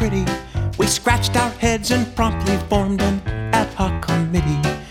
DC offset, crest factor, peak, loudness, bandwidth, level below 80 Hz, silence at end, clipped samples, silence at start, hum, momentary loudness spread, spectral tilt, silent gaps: under 0.1%; 18 dB; 0 dBFS; -20 LUFS; 17 kHz; -30 dBFS; 0 s; under 0.1%; 0 s; none; 5 LU; -5 dB/octave; none